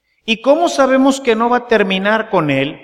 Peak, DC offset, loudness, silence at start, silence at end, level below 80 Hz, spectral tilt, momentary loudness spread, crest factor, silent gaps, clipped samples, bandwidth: 0 dBFS; under 0.1%; -14 LUFS; 0.25 s; 0.05 s; -52 dBFS; -5 dB/octave; 4 LU; 14 dB; none; under 0.1%; 14 kHz